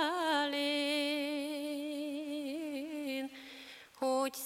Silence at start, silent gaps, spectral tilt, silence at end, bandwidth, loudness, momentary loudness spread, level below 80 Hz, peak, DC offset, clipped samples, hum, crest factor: 0 s; none; -1.5 dB/octave; 0 s; 16.5 kHz; -36 LUFS; 13 LU; -82 dBFS; -20 dBFS; under 0.1%; under 0.1%; none; 16 dB